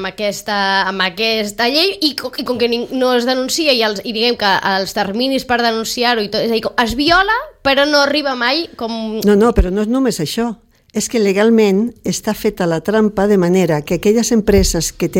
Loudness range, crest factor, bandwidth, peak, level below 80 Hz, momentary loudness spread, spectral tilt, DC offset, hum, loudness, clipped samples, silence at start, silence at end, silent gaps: 2 LU; 14 dB; 17 kHz; 0 dBFS; -32 dBFS; 7 LU; -4 dB/octave; under 0.1%; none; -15 LUFS; under 0.1%; 0 s; 0 s; none